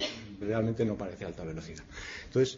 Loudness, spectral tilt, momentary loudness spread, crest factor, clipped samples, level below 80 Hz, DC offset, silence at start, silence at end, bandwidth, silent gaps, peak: -35 LUFS; -5.5 dB/octave; 13 LU; 18 dB; under 0.1%; -54 dBFS; under 0.1%; 0 s; 0 s; 7.8 kHz; none; -16 dBFS